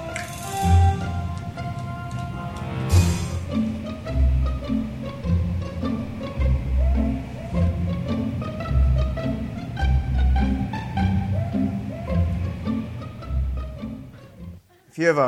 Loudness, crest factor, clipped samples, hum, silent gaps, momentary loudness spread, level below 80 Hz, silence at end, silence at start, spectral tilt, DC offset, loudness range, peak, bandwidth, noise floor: -25 LUFS; 18 dB; under 0.1%; none; none; 10 LU; -28 dBFS; 0 s; 0 s; -7 dB/octave; under 0.1%; 3 LU; -6 dBFS; 13.5 kHz; -44 dBFS